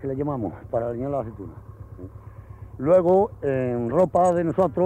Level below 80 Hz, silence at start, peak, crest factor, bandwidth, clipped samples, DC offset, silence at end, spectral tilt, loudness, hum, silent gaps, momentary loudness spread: -48 dBFS; 0 s; -8 dBFS; 16 dB; 8.8 kHz; under 0.1%; under 0.1%; 0 s; -9 dB/octave; -23 LUFS; none; none; 23 LU